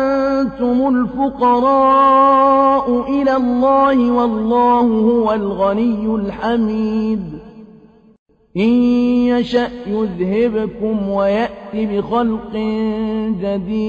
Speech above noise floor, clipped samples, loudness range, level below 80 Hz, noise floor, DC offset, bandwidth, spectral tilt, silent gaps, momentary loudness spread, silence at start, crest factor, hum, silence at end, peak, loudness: 30 dB; under 0.1%; 6 LU; -44 dBFS; -45 dBFS; under 0.1%; 6.8 kHz; -8 dB/octave; 8.19-8.26 s; 9 LU; 0 s; 12 dB; none; 0 s; -4 dBFS; -15 LUFS